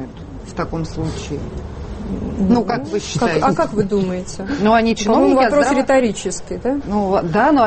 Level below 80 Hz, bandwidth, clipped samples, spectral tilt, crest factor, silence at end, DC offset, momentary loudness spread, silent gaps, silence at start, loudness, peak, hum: -36 dBFS; 8.8 kHz; under 0.1%; -5.5 dB/octave; 14 dB; 0 s; under 0.1%; 13 LU; none; 0 s; -18 LUFS; -4 dBFS; none